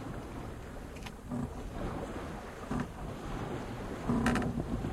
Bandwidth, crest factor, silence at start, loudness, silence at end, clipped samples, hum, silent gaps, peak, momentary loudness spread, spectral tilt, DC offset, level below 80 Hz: 14.5 kHz; 22 dB; 0 s; -38 LUFS; 0 s; under 0.1%; none; none; -16 dBFS; 13 LU; -6.5 dB/octave; under 0.1%; -46 dBFS